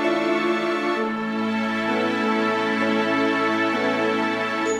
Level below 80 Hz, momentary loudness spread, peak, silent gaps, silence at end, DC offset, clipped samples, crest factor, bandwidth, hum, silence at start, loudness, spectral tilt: -66 dBFS; 3 LU; -10 dBFS; none; 0 s; under 0.1%; under 0.1%; 12 dB; 13 kHz; none; 0 s; -22 LUFS; -4.5 dB/octave